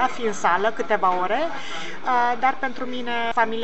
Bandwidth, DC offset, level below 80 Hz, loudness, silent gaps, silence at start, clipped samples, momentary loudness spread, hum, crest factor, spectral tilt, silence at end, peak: 8.2 kHz; 4%; -66 dBFS; -23 LUFS; none; 0 s; under 0.1%; 8 LU; none; 18 dB; -3.5 dB/octave; 0 s; -6 dBFS